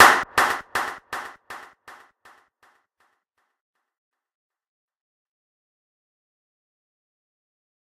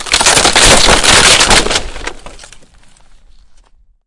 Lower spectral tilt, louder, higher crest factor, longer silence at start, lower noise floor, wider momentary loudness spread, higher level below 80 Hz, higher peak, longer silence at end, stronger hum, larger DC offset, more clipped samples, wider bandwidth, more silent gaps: about the same, -1 dB/octave vs -1 dB/octave; second, -22 LUFS vs -6 LUFS; first, 26 dB vs 10 dB; about the same, 0 s vs 0 s; first, -74 dBFS vs -45 dBFS; first, 23 LU vs 20 LU; second, -62 dBFS vs -24 dBFS; about the same, -2 dBFS vs 0 dBFS; first, 6.4 s vs 1.5 s; neither; neither; second, under 0.1% vs 1%; first, 15.5 kHz vs 12 kHz; neither